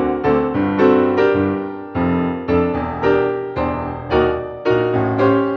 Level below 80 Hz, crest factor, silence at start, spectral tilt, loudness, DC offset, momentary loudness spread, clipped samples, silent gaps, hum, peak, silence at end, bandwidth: -38 dBFS; 16 dB; 0 s; -9 dB/octave; -18 LUFS; under 0.1%; 7 LU; under 0.1%; none; none; -2 dBFS; 0 s; 6.2 kHz